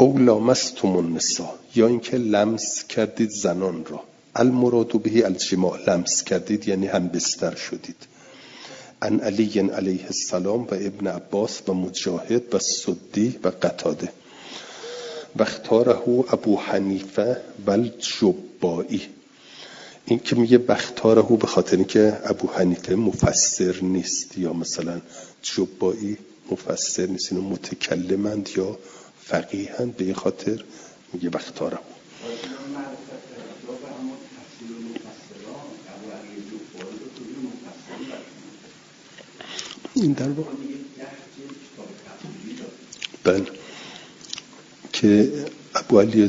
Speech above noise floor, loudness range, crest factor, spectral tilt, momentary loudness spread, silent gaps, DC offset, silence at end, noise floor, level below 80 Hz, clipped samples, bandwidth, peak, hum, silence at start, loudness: 26 dB; 17 LU; 24 dB; -4.5 dB/octave; 21 LU; none; under 0.1%; 0 s; -48 dBFS; -58 dBFS; under 0.1%; 7.8 kHz; 0 dBFS; none; 0 s; -22 LUFS